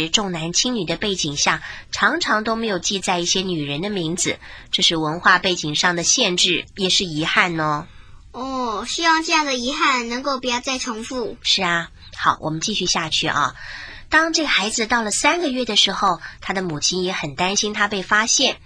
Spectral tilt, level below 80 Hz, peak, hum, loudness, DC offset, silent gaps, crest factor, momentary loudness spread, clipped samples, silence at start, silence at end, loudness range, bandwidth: -2 dB/octave; -46 dBFS; 0 dBFS; none; -19 LUFS; under 0.1%; none; 20 dB; 9 LU; under 0.1%; 0 s; 0.1 s; 3 LU; 10.5 kHz